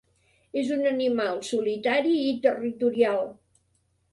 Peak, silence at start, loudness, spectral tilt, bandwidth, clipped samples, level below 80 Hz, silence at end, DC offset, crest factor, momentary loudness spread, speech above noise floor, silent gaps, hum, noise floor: -8 dBFS; 0.55 s; -26 LUFS; -4.5 dB/octave; 11.5 kHz; under 0.1%; -70 dBFS; 0.8 s; under 0.1%; 18 dB; 7 LU; 45 dB; none; none; -70 dBFS